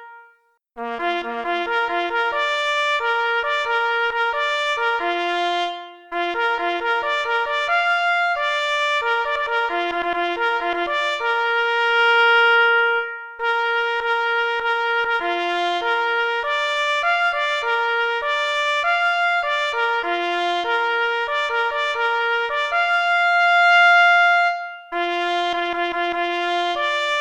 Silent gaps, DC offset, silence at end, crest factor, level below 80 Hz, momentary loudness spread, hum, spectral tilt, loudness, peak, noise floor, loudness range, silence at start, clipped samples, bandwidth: none; under 0.1%; 0 s; 16 dB; -60 dBFS; 8 LU; none; -1 dB/octave; -19 LUFS; -4 dBFS; -58 dBFS; 5 LU; 0 s; under 0.1%; 11 kHz